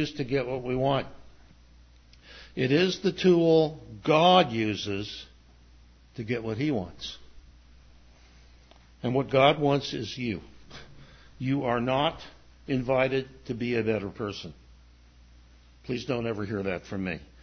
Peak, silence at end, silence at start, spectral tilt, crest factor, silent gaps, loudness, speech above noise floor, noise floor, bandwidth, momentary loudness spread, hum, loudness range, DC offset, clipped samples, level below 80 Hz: -6 dBFS; 0.2 s; 0 s; -6 dB/octave; 22 dB; none; -27 LUFS; 28 dB; -55 dBFS; 6.6 kHz; 21 LU; none; 11 LU; under 0.1%; under 0.1%; -54 dBFS